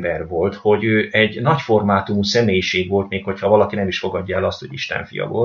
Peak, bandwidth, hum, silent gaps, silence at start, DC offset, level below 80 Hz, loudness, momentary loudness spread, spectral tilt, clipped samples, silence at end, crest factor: 0 dBFS; 7.4 kHz; none; none; 0 s; under 0.1%; -50 dBFS; -18 LUFS; 8 LU; -5.5 dB/octave; under 0.1%; 0 s; 18 dB